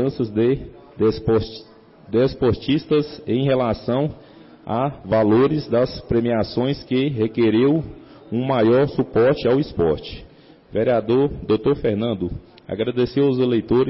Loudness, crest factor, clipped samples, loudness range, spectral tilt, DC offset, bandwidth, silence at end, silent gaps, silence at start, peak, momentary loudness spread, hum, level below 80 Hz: -20 LUFS; 10 dB; under 0.1%; 2 LU; -11 dB/octave; under 0.1%; 5.8 kHz; 0 s; none; 0 s; -10 dBFS; 10 LU; none; -44 dBFS